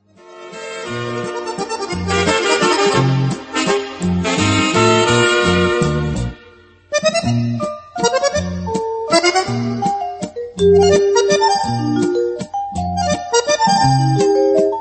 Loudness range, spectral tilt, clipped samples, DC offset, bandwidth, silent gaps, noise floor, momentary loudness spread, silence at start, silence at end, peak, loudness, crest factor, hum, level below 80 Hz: 3 LU; -4.5 dB/octave; under 0.1%; under 0.1%; 8.8 kHz; none; -45 dBFS; 11 LU; 0.25 s; 0 s; 0 dBFS; -16 LUFS; 16 dB; none; -40 dBFS